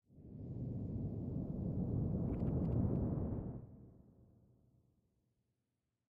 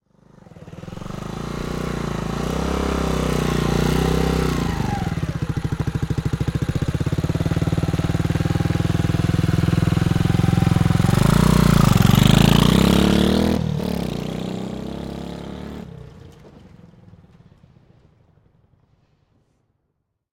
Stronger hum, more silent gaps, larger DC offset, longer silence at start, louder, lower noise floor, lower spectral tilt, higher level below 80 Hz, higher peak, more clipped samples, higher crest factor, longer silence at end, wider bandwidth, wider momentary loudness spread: neither; neither; neither; second, 0.1 s vs 0.55 s; second, -41 LUFS vs -20 LUFS; first, -88 dBFS vs -74 dBFS; first, -13 dB/octave vs -6.5 dB/octave; second, -52 dBFS vs -32 dBFS; second, -24 dBFS vs 0 dBFS; neither; about the same, 18 dB vs 20 dB; second, 2.15 s vs 3.85 s; second, 2.8 kHz vs 17 kHz; about the same, 16 LU vs 16 LU